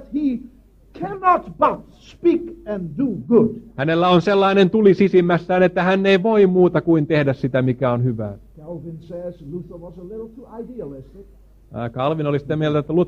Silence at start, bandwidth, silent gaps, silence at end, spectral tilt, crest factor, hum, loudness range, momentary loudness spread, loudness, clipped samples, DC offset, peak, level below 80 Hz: 0 s; 7 kHz; none; 0 s; -8.5 dB/octave; 16 dB; none; 15 LU; 20 LU; -18 LUFS; under 0.1%; under 0.1%; -2 dBFS; -48 dBFS